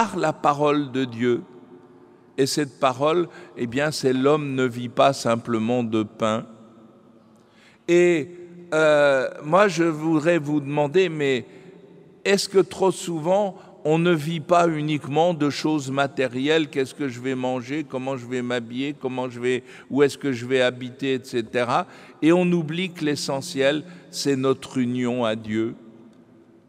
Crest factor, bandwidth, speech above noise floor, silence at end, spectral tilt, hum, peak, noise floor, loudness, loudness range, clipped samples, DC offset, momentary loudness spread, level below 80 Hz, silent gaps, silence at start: 18 dB; 15 kHz; 32 dB; 0.7 s; -5.5 dB/octave; none; -4 dBFS; -54 dBFS; -23 LUFS; 4 LU; under 0.1%; under 0.1%; 9 LU; -70 dBFS; none; 0 s